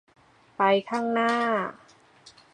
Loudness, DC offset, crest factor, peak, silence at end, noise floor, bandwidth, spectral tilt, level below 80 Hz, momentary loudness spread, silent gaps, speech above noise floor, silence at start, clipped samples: -25 LUFS; under 0.1%; 20 dB; -8 dBFS; 0.8 s; -55 dBFS; 10.5 kHz; -5 dB/octave; -76 dBFS; 6 LU; none; 30 dB; 0.6 s; under 0.1%